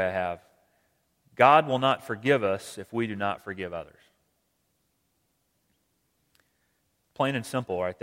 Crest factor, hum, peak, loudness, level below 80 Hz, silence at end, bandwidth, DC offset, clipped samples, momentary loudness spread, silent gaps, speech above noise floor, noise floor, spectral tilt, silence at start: 26 dB; none; -4 dBFS; -26 LUFS; -68 dBFS; 0.1 s; 16.5 kHz; under 0.1%; under 0.1%; 16 LU; none; 48 dB; -74 dBFS; -5.5 dB/octave; 0 s